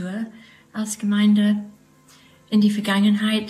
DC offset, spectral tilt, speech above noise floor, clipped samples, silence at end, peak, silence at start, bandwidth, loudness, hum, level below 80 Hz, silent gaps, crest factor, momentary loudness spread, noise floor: under 0.1%; -5.5 dB/octave; 33 dB; under 0.1%; 0 s; -8 dBFS; 0 s; 13.5 kHz; -20 LUFS; none; -68 dBFS; none; 14 dB; 16 LU; -52 dBFS